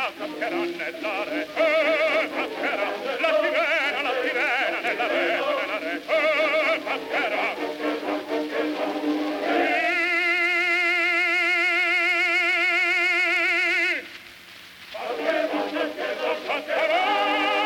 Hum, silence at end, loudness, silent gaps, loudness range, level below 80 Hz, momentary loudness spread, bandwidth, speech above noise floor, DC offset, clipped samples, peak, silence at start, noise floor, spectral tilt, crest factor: none; 0 s; -22 LUFS; none; 6 LU; -70 dBFS; 9 LU; 17 kHz; 20 dB; under 0.1%; under 0.1%; -10 dBFS; 0 s; -45 dBFS; -2.5 dB/octave; 14 dB